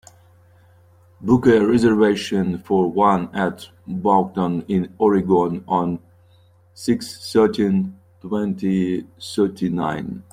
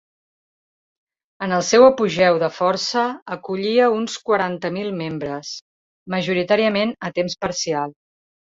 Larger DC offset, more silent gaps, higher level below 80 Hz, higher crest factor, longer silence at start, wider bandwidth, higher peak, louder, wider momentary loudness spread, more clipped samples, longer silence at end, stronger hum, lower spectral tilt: neither; second, none vs 3.22-3.26 s, 5.62-6.06 s; first, -54 dBFS vs -60 dBFS; about the same, 18 dB vs 18 dB; second, 1.2 s vs 1.4 s; first, 14.5 kHz vs 7.8 kHz; about the same, -2 dBFS vs -2 dBFS; about the same, -20 LUFS vs -20 LUFS; about the same, 12 LU vs 13 LU; neither; second, 0.1 s vs 0.65 s; neither; first, -7 dB/octave vs -4.5 dB/octave